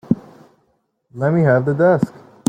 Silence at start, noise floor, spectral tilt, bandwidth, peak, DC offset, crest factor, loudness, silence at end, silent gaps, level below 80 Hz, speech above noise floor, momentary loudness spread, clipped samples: 0.1 s; -65 dBFS; -8 dB/octave; 9.4 kHz; -2 dBFS; under 0.1%; 16 dB; -17 LUFS; 0.4 s; none; -56 dBFS; 50 dB; 8 LU; under 0.1%